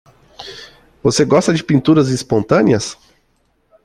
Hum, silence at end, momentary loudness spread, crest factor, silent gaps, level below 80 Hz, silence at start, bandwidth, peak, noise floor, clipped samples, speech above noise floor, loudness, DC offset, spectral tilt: none; 0.9 s; 20 LU; 16 dB; none; -48 dBFS; 0.4 s; 12.5 kHz; -2 dBFS; -61 dBFS; under 0.1%; 47 dB; -14 LUFS; under 0.1%; -5.5 dB/octave